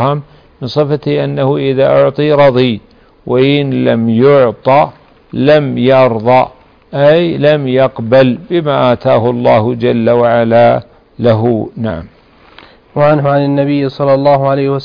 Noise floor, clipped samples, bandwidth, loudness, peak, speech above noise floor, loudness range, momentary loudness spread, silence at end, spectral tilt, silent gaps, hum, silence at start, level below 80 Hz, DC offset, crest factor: -40 dBFS; under 0.1%; 5.2 kHz; -10 LUFS; 0 dBFS; 30 dB; 3 LU; 9 LU; 0 s; -9 dB/octave; none; none; 0 s; -44 dBFS; under 0.1%; 10 dB